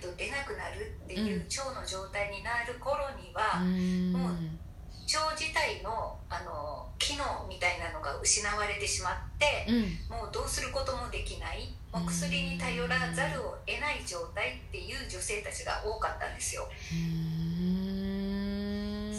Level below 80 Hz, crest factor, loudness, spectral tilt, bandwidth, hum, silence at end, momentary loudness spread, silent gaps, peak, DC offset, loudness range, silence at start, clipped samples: -46 dBFS; 20 dB; -33 LUFS; -3.5 dB/octave; 13 kHz; none; 0 s; 9 LU; none; -14 dBFS; under 0.1%; 4 LU; 0 s; under 0.1%